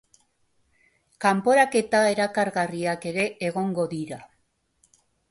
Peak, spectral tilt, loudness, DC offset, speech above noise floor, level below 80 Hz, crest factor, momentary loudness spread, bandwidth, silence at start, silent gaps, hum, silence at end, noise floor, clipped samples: -6 dBFS; -5 dB/octave; -24 LUFS; under 0.1%; 47 dB; -66 dBFS; 18 dB; 10 LU; 11.5 kHz; 1.2 s; none; none; 1.05 s; -70 dBFS; under 0.1%